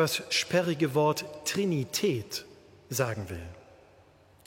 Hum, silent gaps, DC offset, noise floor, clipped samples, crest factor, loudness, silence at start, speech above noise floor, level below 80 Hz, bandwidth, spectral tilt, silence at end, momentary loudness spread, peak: none; none; under 0.1%; -59 dBFS; under 0.1%; 18 dB; -29 LUFS; 0 s; 30 dB; -60 dBFS; 16.5 kHz; -4 dB/octave; 0.85 s; 12 LU; -12 dBFS